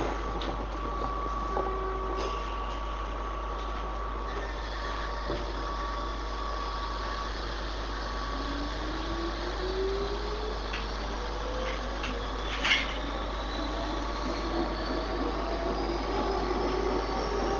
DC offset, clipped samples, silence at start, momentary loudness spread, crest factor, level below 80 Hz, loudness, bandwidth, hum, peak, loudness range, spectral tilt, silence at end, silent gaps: under 0.1%; under 0.1%; 0 s; 5 LU; 22 dB; -36 dBFS; -33 LUFS; 7.4 kHz; none; -10 dBFS; 4 LU; -5 dB/octave; 0 s; none